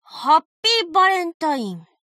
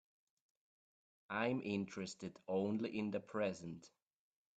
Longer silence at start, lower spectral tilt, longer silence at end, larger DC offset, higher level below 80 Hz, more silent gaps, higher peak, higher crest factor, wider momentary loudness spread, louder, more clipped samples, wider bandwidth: second, 0.1 s vs 1.3 s; second, -2.5 dB/octave vs -6 dB/octave; second, 0.3 s vs 0.7 s; neither; first, -76 dBFS vs -82 dBFS; first, 0.45-0.63 s, 1.34-1.40 s vs none; first, -4 dBFS vs -24 dBFS; about the same, 16 dB vs 20 dB; about the same, 11 LU vs 11 LU; first, -18 LUFS vs -42 LUFS; neither; first, 15 kHz vs 9 kHz